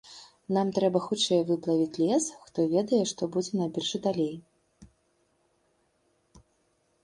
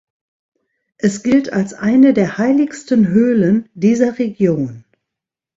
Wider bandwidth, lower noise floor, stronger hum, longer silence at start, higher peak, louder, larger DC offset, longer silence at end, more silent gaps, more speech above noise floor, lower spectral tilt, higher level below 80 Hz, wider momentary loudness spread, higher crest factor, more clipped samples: first, 11.5 kHz vs 8 kHz; second, -71 dBFS vs -84 dBFS; neither; second, 0.05 s vs 1.05 s; second, -10 dBFS vs -2 dBFS; second, -28 LUFS vs -15 LUFS; neither; about the same, 0.65 s vs 0.75 s; neither; second, 44 dB vs 70 dB; second, -5 dB/octave vs -7 dB/octave; second, -68 dBFS vs -56 dBFS; about the same, 7 LU vs 8 LU; about the same, 18 dB vs 14 dB; neither